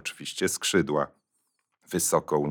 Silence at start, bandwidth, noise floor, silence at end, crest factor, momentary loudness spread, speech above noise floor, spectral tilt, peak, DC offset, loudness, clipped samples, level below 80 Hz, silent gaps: 0.05 s; over 20 kHz; -77 dBFS; 0 s; 20 dB; 9 LU; 50 dB; -3.5 dB/octave; -8 dBFS; under 0.1%; -27 LUFS; under 0.1%; -66 dBFS; none